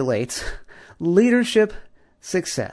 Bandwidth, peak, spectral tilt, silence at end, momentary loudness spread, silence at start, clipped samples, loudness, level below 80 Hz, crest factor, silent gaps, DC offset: 11 kHz; -4 dBFS; -5 dB/octave; 0 s; 18 LU; 0 s; under 0.1%; -21 LUFS; -44 dBFS; 18 dB; none; under 0.1%